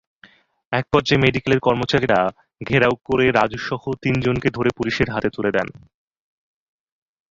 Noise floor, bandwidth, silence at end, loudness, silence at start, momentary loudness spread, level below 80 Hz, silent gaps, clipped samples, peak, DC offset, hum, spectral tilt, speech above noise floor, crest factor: -52 dBFS; 7.6 kHz; 1.6 s; -20 LUFS; 0.7 s; 8 LU; -46 dBFS; none; under 0.1%; -2 dBFS; under 0.1%; none; -6.5 dB/octave; 33 dB; 18 dB